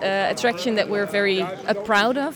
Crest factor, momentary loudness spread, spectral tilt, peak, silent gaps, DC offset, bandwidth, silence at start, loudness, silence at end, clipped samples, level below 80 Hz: 14 dB; 5 LU; -4 dB/octave; -6 dBFS; none; under 0.1%; 20 kHz; 0 s; -21 LUFS; 0 s; under 0.1%; -62 dBFS